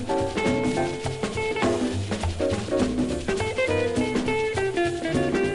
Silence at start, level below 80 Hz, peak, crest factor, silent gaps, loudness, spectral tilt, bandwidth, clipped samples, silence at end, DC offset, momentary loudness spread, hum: 0 s; -42 dBFS; -10 dBFS; 14 dB; none; -25 LUFS; -5.5 dB/octave; 11.5 kHz; under 0.1%; 0 s; under 0.1%; 4 LU; none